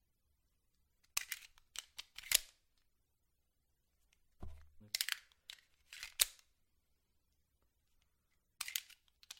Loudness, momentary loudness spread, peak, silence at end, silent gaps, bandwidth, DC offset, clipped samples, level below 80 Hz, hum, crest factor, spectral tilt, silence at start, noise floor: -39 LUFS; 23 LU; -6 dBFS; 0.05 s; none; 16.5 kHz; under 0.1%; under 0.1%; -68 dBFS; none; 42 dB; 2 dB/octave; 1.15 s; -82 dBFS